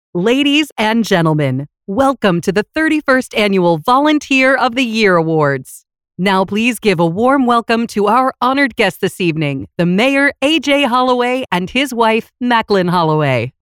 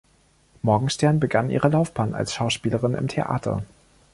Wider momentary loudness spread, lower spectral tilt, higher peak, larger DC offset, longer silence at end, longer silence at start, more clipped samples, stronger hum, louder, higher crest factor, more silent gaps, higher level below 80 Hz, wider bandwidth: about the same, 5 LU vs 7 LU; about the same, -5.5 dB/octave vs -6 dB/octave; first, 0 dBFS vs -4 dBFS; neither; second, 0.1 s vs 0.5 s; second, 0.15 s vs 0.65 s; neither; neither; first, -14 LUFS vs -23 LUFS; second, 12 dB vs 18 dB; first, 0.72-0.76 s vs none; about the same, -50 dBFS vs -50 dBFS; first, 17 kHz vs 11.5 kHz